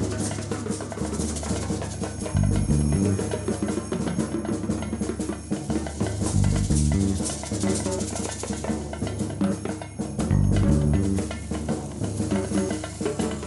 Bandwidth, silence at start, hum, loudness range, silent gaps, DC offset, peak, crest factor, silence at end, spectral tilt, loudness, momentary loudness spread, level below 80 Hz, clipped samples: 12 kHz; 0 s; none; 2 LU; none; under 0.1%; -8 dBFS; 16 dB; 0 s; -6 dB/octave; -26 LUFS; 8 LU; -34 dBFS; under 0.1%